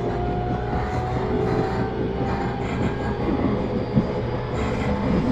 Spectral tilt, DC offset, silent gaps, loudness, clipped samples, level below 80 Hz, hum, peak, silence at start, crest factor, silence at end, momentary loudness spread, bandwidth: -8 dB/octave; under 0.1%; none; -24 LUFS; under 0.1%; -34 dBFS; none; -6 dBFS; 0 s; 18 dB; 0 s; 3 LU; 8.4 kHz